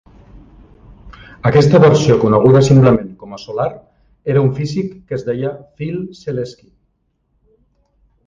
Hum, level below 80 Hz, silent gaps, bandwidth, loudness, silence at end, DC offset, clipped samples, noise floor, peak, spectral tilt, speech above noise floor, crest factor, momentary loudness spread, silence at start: none; -42 dBFS; none; 7.6 kHz; -14 LUFS; 1.75 s; under 0.1%; under 0.1%; -65 dBFS; 0 dBFS; -7.5 dB/octave; 51 dB; 16 dB; 17 LU; 1.05 s